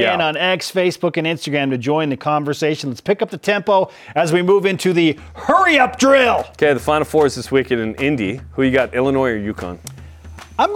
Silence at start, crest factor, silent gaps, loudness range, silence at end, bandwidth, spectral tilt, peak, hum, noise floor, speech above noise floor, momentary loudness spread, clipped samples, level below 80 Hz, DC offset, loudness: 0 s; 16 dB; none; 4 LU; 0 s; 17 kHz; -5 dB/octave; 0 dBFS; none; -37 dBFS; 20 dB; 9 LU; under 0.1%; -48 dBFS; under 0.1%; -17 LUFS